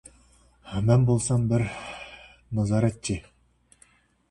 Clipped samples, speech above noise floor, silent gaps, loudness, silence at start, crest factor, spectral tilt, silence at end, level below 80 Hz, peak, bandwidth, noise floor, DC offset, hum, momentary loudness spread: under 0.1%; 39 dB; none; -25 LUFS; 0.65 s; 20 dB; -6.5 dB/octave; 1.1 s; -48 dBFS; -6 dBFS; 11.5 kHz; -62 dBFS; under 0.1%; none; 18 LU